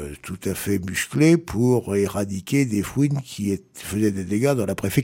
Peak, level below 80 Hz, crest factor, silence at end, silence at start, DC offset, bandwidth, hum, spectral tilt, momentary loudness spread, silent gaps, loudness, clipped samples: -4 dBFS; -50 dBFS; 18 dB; 0 s; 0 s; under 0.1%; 17 kHz; none; -6 dB/octave; 10 LU; none; -22 LUFS; under 0.1%